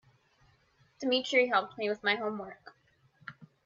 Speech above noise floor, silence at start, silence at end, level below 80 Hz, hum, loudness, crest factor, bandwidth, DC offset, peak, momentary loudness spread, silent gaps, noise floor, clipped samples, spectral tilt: 38 dB; 1 s; 0.2 s; -78 dBFS; none; -30 LUFS; 20 dB; 7.6 kHz; under 0.1%; -14 dBFS; 23 LU; none; -68 dBFS; under 0.1%; -3.5 dB/octave